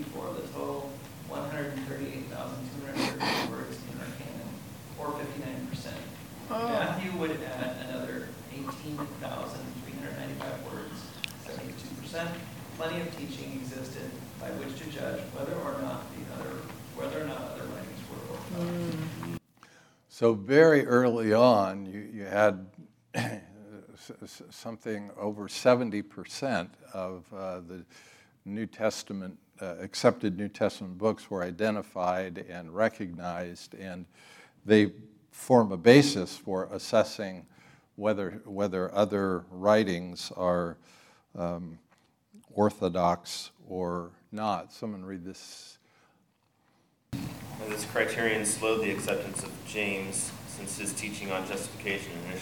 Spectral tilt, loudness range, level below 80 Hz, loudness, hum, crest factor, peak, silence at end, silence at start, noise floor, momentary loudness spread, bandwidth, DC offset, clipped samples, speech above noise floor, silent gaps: -5 dB/octave; 13 LU; -66 dBFS; -31 LUFS; none; 26 dB; -4 dBFS; 0 s; 0 s; -70 dBFS; 17 LU; 18 kHz; under 0.1%; under 0.1%; 41 dB; none